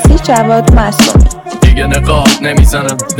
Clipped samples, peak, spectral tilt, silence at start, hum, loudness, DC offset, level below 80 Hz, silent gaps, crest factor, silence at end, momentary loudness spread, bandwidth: 0.3%; 0 dBFS; -5 dB/octave; 0 s; none; -9 LUFS; under 0.1%; -10 dBFS; none; 8 dB; 0 s; 3 LU; 17.5 kHz